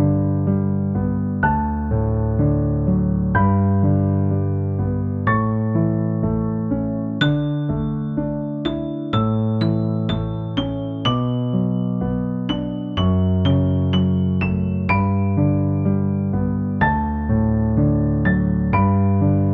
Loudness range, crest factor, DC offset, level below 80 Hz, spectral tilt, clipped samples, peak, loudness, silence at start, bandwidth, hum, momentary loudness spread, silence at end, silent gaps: 3 LU; 16 dB; under 0.1%; -34 dBFS; -9.5 dB/octave; under 0.1%; -2 dBFS; -20 LUFS; 0 s; 5 kHz; none; 6 LU; 0 s; none